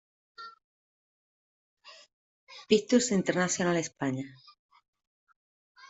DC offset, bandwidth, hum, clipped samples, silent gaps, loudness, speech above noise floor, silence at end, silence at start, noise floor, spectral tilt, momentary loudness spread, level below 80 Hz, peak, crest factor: under 0.1%; 8.2 kHz; none; under 0.1%; 0.64-1.77 s, 2.13-2.47 s, 4.59-4.69 s, 4.88-4.93 s, 5.07-5.27 s, 5.36-5.75 s; -28 LUFS; over 62 dB; 0.05 s; 0.4 s; under -90 dBFS; -4 dB/octave; 23 LU; -72 dBFS; -10 dBFS; 22 dB